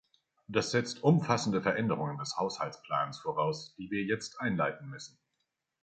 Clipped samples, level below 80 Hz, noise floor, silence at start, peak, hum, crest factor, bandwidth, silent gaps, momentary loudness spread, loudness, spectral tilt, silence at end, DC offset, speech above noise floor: under 0.1%; -68 dBFS; -83 dBFS; 0.5 s; -10 dBFS; none; 22 dB; 9.2 kHz; none; 11 LU; -32 LUFS; -5.5 dB/octave; 0.75 s; under 0.1%; 51 dB